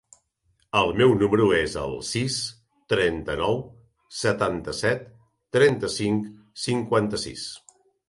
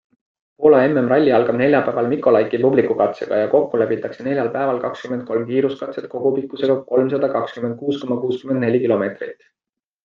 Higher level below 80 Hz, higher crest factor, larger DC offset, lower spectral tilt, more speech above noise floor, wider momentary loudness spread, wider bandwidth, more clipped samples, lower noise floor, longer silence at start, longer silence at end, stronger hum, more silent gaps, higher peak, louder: first, -50 dBFS vs -64 dBFS; about the same, 18 dB vs 18 dB; neither; second, -5 dB/octave vs -8.5 dB/octave; second, 46 dB vs 69 dB; first, 13 LU vs 9 LU; first, 11.5 kHz vs 7 kHz; neither; second, -69 dBFS vs -87 dBFS; first, 0.75 s vs 0.6 s; second, 0.5 s vs 0.7 s; neither; neither; second, -6 dBFS vs 0 dBFS; second, -24 LUFS vs -18 LUFS